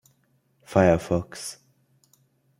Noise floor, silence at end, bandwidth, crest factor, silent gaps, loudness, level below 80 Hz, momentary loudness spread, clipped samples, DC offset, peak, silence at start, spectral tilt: -67 dBFS; 1.05 s; 16 kHz; 24 dB; none; -24 LUFS; -54 dBFS; 16 LU; under 0.1%; under 0.1%; -4 dBFS; 0.7 s; -6.5 dB/octave